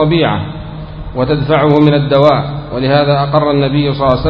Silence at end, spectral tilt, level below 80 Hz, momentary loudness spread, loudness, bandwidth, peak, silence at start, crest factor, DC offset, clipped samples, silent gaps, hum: 0 s; -9 dB/octave; -30 dBFS; 14 LU; -12 LUFS; 5.4 kHz; 0 dBFS; 0 s; 12 dB; under 0.1%; 0.2%; none; none